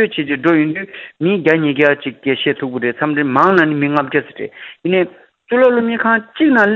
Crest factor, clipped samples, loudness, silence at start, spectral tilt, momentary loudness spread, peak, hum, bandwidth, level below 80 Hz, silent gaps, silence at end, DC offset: 14 dB; under 0.1%; -15 LUFS; 0 s; -8 dB/octave; 11 LU; 0 dBFS; none; 7 kHz; -60 dBFS; none; 0 s; under 0.1%